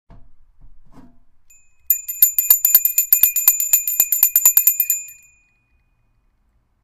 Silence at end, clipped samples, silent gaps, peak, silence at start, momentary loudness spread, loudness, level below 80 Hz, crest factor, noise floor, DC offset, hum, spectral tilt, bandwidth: 1.7 s; under 0.1%; none; 0 dBFS; 0.2 s; 8 LU; -13 LUFS; -54 dBFS; 20 dB; -62 dBFS; under 0.1%; none; 3 dB/octave; 17 kHz